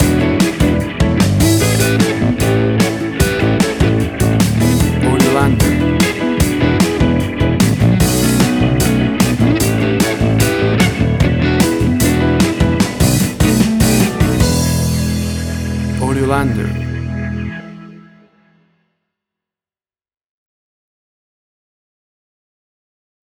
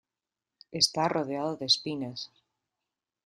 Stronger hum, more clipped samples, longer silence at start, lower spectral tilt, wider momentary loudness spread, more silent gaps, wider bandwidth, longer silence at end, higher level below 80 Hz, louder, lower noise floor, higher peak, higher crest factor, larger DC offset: neither; neither; second, 0 s vs 0.7 s; first, -5.5 dB/octave vs -3 dB/octave; second, 6 LU vs 16 LU; neither; first, over 20 kHz vs 13 kHz; first, 5.4 s vs 1 s; first, -26 dBFS vs -72 dBFS; first, -14 LUFS vs -28 LUFS; about the same, under -90 dBFS vs under -90 dBFS; first, 0 dBFS vs -10 dBFS; second, 14 dB vs 22 dB; neither